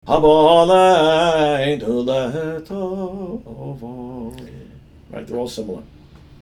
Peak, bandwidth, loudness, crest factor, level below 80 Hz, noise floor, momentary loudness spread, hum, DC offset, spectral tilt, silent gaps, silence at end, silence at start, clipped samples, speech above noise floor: -2 dBFS; 13 kHz; -16 LUFS; 18 dB; -44 dBFS; -43 dBFS; 21 LU; none; under 0.1%; -5.5 dB/octave; none; 0.55 s; 0.05 s; under 0.1%; 26 dB